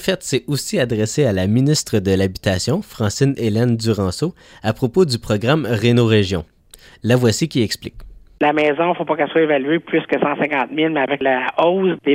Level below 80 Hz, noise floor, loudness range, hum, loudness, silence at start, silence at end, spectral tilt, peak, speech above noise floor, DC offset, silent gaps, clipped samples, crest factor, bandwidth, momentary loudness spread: -46 dBFS; -46 dBFS; 1 LU; none; -18 LUFS; 0 s; 0 s; -5.5 dB/octave; -2 dBFS; 28 dB; under 0.1%; none; under 0.1%; 16 dB; 16 kHz; 6 LU